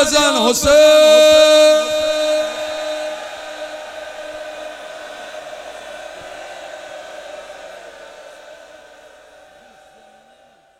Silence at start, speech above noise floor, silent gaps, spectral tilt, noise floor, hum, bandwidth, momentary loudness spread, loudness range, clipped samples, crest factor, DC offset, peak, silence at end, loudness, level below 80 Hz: 0 s; 41 dB; none; -1.5 dB/octave; -51 dBFS; none; 15.5 kHz; 25 LU; 24 LU; under 0.1%; 16 dB; under 0.1%; 0 dBFS; 2.25 s; -12 LUFS; -48 dBFS